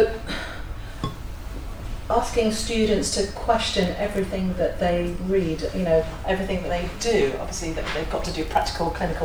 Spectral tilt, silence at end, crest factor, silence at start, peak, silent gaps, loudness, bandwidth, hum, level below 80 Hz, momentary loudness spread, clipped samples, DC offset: -4.5 dB/octave; 0 s; 18 dB; 0 s; -6 dBFS; none; -24 LUFS; over 20 kHz; none; -34 dBFS; 13 LU; under 0.1%; under 0.1%